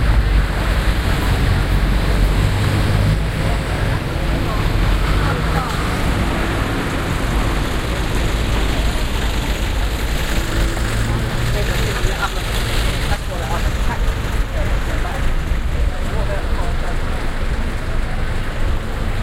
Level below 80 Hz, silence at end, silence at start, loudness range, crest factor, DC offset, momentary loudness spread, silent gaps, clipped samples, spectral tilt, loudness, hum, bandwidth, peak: -20 dBFS; 0 s; 0 s; 4 LU; 14 dB; under 0.1%; 6 LU; none; under 0.1%; -5.5 dB/octave; -20 LUFS; none; 16 kHz; -2 dBFS